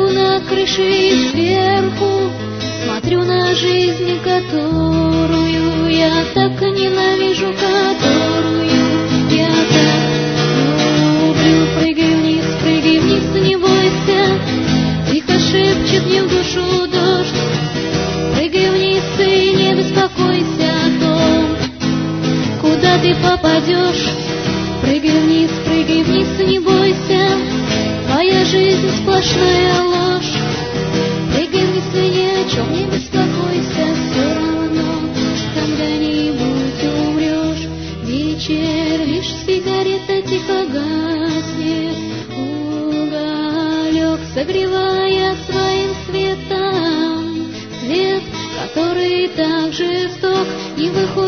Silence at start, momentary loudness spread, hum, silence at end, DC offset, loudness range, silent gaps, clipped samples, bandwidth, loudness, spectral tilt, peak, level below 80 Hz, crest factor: 0 s; 7 LU; none; 0 s; 0.2%; 5 LU; none; under 0.1%; 6.6 kHz; -15 LUFS; -5.5 dB/octave; 0 dBFS; -38 dBFS; 14 dB